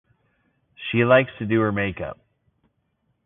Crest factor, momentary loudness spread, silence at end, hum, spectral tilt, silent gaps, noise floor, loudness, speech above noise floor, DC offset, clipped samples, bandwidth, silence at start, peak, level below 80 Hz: 20 dB; 17 LU; 1.15 s; none; -11 dB/octave; none; -71 dBFS; -21 LUFS; 51 dB; under 0.1%; under 0.1%; 3.9 kHz; 0.8 s; -4 dBFS; -52 dBFS